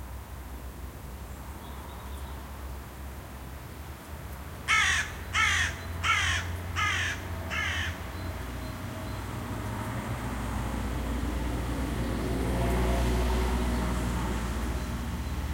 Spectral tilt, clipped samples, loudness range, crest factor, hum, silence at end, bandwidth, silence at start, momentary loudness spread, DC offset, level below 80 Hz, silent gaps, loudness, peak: -4 dB/octave; under 0.1%; 14 LU; 18 dB; none; 0 s; 16.5 kHz; 0 s; 17 LU; under 0.1%; -36 dBFS; none; -30 LUFS; -12 dBFS